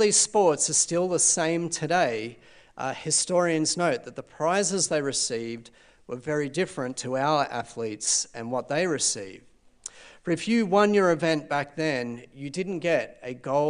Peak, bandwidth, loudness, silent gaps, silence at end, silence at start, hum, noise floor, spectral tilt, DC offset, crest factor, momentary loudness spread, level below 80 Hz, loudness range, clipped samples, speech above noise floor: -6 dBFS; 10.5 kHz; -25 LUFS; none; 0 s; 0 s; none; -46 dBFS; -3 dB/octave; under 0.1%; 20 dB; 16 LU; -66 dBFS; 4 LU; under 0.1%; 20 dB